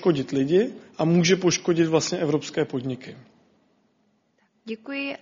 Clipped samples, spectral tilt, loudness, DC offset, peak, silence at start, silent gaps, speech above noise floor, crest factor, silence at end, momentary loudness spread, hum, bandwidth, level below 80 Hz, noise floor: under 0.1%; -5.5 dB/octave; -23 LUFS; under 0.1%; -8 dBFS; 0 s; none; 44 dB; 16 dB; 0.05 s; 15 LU; none; 7.4 kHz; -64 dBFS; -67 dBFS